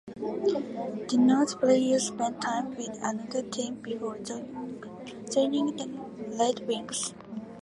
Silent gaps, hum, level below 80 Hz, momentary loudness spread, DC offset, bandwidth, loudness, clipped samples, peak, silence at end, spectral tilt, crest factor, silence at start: none; none; -70 dBFS; 15 LU; under 0.1%; 11.5 kHz; -29 LUFS; under 0.1%; -10 dBFS; 0 s; -4 dB/octave; 18 dB; 0.05 s